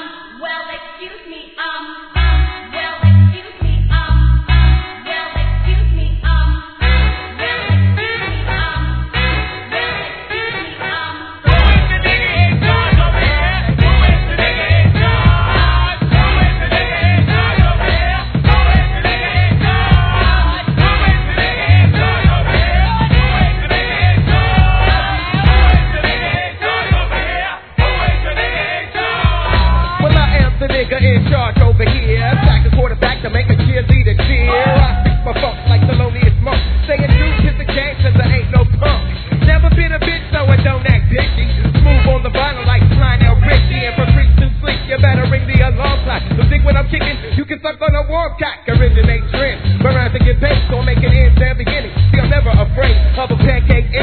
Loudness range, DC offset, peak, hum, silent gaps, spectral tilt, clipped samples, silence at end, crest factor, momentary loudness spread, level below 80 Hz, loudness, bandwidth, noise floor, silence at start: 4 LU; 0.2%; 0 dBFS; none; none; -9.5 dB/octave; under 0.1%; 0 s; 12 dB; 8 LU; -16 dBFS; -13 LUFS; 4.5 kHz; -33 dBFS; 0 s